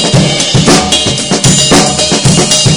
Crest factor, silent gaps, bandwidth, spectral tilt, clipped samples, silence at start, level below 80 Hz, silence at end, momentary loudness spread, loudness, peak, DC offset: 8 dB; none; over 20 kHz; -3.5 dB/octave; 1%; 0 s; -28 dBFS; 0 s; 3 LU; -7 LUFS; 0 dBFS; under 0.1%